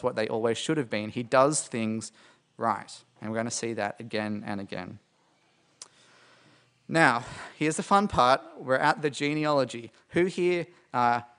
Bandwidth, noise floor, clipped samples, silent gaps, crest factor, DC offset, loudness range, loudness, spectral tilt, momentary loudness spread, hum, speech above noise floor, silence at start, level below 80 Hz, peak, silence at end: 10.5 kHz; -67 dBFS; under 0.1%; none; 24 dB; under 0.1%; 9 LU; -27 LUFS; -4.5 dB/octave; 13 LU; none; 39 dB; 0 s; -62 dBFS; -4 dBFS; 0.15 s